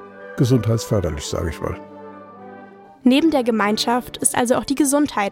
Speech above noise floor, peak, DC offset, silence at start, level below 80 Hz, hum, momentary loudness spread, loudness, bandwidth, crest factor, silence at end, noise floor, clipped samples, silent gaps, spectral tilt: 24 dB; -2 dBFS; under 0.1%; 0 s; -44 dBFS; none; 22 LU; -19 LUFS; 16.5 kHz; 18 dB; 0 s; -42 dBFS; under 0.1%; none; -5 dB/octave